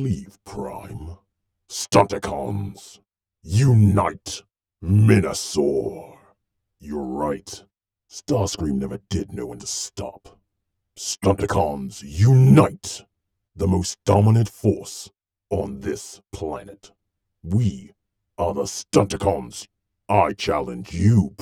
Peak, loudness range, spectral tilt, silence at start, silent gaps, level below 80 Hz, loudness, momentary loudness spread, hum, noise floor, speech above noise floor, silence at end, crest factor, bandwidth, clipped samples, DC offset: -2 dBFS; 9 LU; -6.5 dB/octave; 0 s; none; -46 dBFS; -21 LUFS; 20 LU; none; -78 dBFS; 57 dB; 0.1 s; 20 dB; 13.5 kHz; under 0.1%; under 0.1%